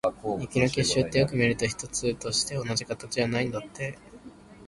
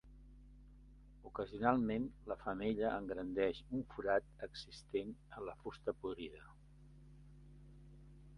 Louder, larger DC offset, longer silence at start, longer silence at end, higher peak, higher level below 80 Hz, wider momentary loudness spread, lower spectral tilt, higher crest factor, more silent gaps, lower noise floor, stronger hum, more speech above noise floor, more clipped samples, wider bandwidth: first, -27 LUFS vs -41 LUFS; neither; about the same, 0.05 s vs 0.05 s; about the same, 0 s vs 0 s; first, -8 dBFS vs -16 dBFS; first, -52 dBFS vs -60 dBFS; second, 10 LU vs 24 LU; second, -4 dB/octave vs -7 dB/octave; second, 20 dB vs 26 dB; neither; second, -48 dBFS vs -61 dBFS; neither; about the same, 21 dB vs 20 dB; neither; about the same, 11.5 kHz vs 11 kHz